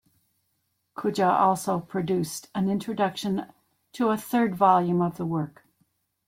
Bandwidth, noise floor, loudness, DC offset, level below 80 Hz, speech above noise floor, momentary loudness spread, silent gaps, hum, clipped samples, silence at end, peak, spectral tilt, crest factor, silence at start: 16.5 kHz; -75 dBFS; -25 LUFS; under 0.1%; -66 dBFS; 50 dB; 11 LU; none; none; under 0.1%; 0.8 s; -6 dBFS; -6 dB/octave; 20 dB; 0.95 s